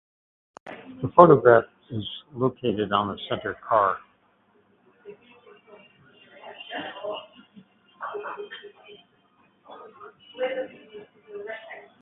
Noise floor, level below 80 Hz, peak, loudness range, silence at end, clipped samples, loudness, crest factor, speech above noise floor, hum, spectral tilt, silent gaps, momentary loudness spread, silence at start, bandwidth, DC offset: -63 dBFS; -62 dBFS; 0 dBFS; 19 LU; 0.2 s; under 0.1%; -23 LUFS; 26 dB; 42 dB; none; -9 dB/octave; none; 29 LU; 0.65 s; 4 kHz; under 0.1%